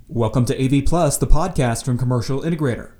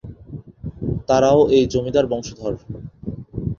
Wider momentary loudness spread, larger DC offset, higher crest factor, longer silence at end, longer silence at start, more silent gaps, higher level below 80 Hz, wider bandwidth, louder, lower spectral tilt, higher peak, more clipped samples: second, 3 LU vs 21 LU; neither; about the same, 18 dB vs 18 dB; about the same, 0.1 s vs 0.05 s; about the same, 0.1 s vs 0.05 s; neither; first, -26 dBFS vs -40 dBFS; first, 16.5 kHz vs 7.4 kHz; about the same, -20 LUFS vs -19 LUFS; about the same, -6 dB/octave vs -6.5 dB/octave; about the same, 0 dBFS vs -2 dBFS; neither